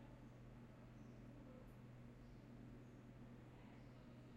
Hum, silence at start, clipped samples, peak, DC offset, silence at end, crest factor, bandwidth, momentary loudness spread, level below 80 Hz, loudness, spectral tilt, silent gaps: none; 0 s; under 0.1%; -48 dBFS; under 0.1%; 0 s; 12 dB; 9.4 kHz; 1 LU; -70 dBFS; -61 LUFS; -7.5 dB/octave; none